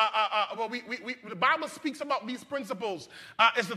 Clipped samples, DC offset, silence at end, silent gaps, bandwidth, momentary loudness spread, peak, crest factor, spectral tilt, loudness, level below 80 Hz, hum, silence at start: under 0.1%; under 0.1%; 0 s; none; 14.5 kHz; 12 LU; -8 dBFS; 22 dB; -3 dB/octave; -30 LUFS; -82 dBFS; none; 0 s